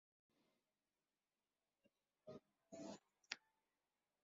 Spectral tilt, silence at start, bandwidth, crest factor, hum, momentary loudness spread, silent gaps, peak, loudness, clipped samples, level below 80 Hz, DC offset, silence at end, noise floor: -2 dB/octave; 2.25 s; 7.4 kHz; 40 dB; 50 Hz at -90 dBFS; 9 LU; none; -24 dBFS; -58 LUFS; under 0.1%; under -90 dBFS; under 0.1%; 0.85 s; under -90 dBFS